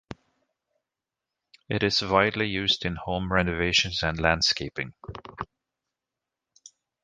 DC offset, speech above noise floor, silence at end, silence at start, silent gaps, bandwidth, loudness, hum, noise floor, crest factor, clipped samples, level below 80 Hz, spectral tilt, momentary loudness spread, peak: under 0.1%; 62 dB; 1.6 s; 1.7 s; none; 10 kHz; -24 LUFS; none; -88 dBFS; 24 dB; under 0.1%; -46 dBFS; -4 dB/octave; 18 LU; -4 dBFS